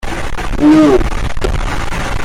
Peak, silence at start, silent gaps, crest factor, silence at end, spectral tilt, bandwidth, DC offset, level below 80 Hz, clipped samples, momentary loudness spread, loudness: -2 dBFS; 0 s; none; 10 dB; 0 s; -6 dB/octave; 14 kHz; under 0.1%; -18 dBFS; under 0.1%; 13 LU; -13 LUFS